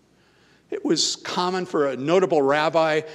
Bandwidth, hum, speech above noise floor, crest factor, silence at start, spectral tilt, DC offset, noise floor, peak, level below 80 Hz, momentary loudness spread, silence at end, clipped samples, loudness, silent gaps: 12.5 kHz; none; 37 dB; 16 dB; 0.7 s; -3.5 dB/octave; under 0.1%; -58 dBFS; -6 dBFS; -70 dBFS; 5 LU; 0 s; under 0.1%; -22 LUFS; none